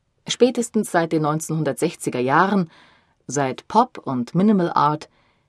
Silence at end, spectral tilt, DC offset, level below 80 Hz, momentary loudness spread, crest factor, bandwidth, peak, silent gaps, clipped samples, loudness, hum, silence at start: 0.45 s; -5.5 dB/octave; under 0.1%; -66 dBFS; 8 LU; 18 dB; 13 kHz; -2 dBFS; none; under 0.1%; -21 LUFS; none; 0.25 s